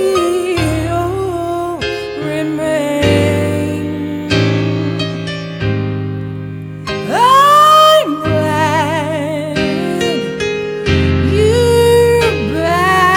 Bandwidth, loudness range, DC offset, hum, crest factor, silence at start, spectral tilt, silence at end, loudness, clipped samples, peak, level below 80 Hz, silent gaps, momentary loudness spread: 20 kHz; 6 LU; under 0.1%; none; 14 dB; 0 s; -5.5 dB/octave; 0 s; -13 LUFS; under 0.1%; 0 dBFS; -34 dBFS; none; 12 LU